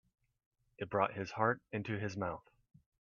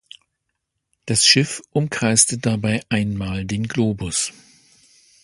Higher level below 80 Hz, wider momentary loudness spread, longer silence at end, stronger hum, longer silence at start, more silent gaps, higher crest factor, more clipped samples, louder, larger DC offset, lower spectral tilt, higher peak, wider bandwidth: second, -72 dBFS vs -46 dBFS; about the same, 9 LU vs 11 LU; second, 0.6 s vs 0.95 s; neither; second, 0.8 s vs 1.05 s; neither; about the same, 24 dB vs 22 dB; neither; second, -38 LUFS vs -19 LUFS; neither; first, -5.5 dB/octave vs -3 dB/octave; second, -16 dBFS vs 0 dBFS; second, 7.2 kHz vs 11.5 kHz